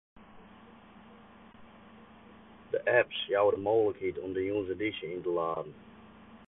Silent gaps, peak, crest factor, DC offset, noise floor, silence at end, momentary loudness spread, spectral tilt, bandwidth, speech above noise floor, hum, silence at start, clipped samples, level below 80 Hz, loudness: none; -14 dBFS; 20 dB; under 0.1%; -55 dBFS; 0.05 s; 10 LU; -8.5 dB/octave; 4 kHz; 24 dB; none; 0.2 s; under 0.1%; -64 dBFS; -31 LUFS